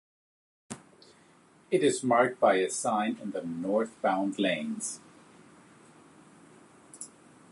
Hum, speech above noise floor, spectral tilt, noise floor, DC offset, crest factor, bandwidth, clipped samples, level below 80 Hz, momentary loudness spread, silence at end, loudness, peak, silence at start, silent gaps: none; 32 dB; -4 dB/octave; -60 dBFS; under 0.1%; 22 dB; 11.5 kHz; under 0.1%; -78 dBFS; 20 LU; 0.45 s; -28 LUFS; -10 dBFS; 0.7 s; none